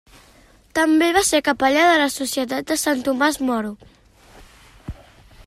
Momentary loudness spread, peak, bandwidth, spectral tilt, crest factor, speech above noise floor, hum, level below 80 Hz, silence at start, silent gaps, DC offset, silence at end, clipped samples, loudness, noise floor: 19 LU; -4 dBFS; 15.5 kHz; -2.5 dB/octave; 18 dB; 33 dB; none; -48 dBFS; 0.75 s; none; under 0.1%; 0.55 s; under 0.1%; -18 LUFS; -52 dBFS